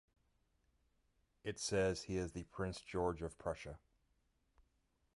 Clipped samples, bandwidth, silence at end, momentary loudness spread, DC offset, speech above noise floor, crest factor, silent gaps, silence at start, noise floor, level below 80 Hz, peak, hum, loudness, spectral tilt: under 0.1%; 11.5 kHz; 1.4 s; 12 LU; under 0.1%; 39 dB; 20 dB; none; 1.45 s; -80 dBFS; -60 dBFS; -24 dBFS; none; -42 LUFS; -4.5 dB/octave